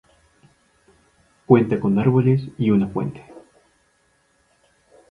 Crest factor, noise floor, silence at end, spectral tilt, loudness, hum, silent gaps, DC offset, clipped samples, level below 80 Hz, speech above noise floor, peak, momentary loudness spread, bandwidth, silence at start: 22 dB; -63 dBFS; 1.7 s; -10 dB/octave; -19 LUFS; none; none; under 0.1%; under 0.1%; -56 dBFS; 45 dB; -2 dBFS; 12 LU; 4.9 kHz; 1.5 s